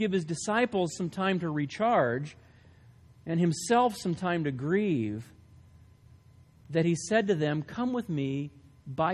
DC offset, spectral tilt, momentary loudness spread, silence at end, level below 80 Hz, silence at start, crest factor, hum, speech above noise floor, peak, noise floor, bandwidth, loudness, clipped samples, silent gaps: under 0.1%; -6 dB/octave; 10 LU; 0 s; -62 dBFS; 0 s; 18 dB; none; 29 dB; -12 dBFS; -57 dBFS; 13 kHz; -29 LUFS; under 0.1%; none